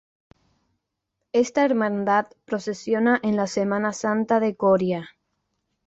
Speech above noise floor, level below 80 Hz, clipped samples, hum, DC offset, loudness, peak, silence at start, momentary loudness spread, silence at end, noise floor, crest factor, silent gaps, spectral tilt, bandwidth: 58 dB; -66 dBFS; under 0.1%; none; under 0.1%; -23 LUFS; -8 dBFS; 1.35 s; 8 LU; 0.8 s; -80 dBFS; 16 dB; none; -6 dB/octave; 8 kHz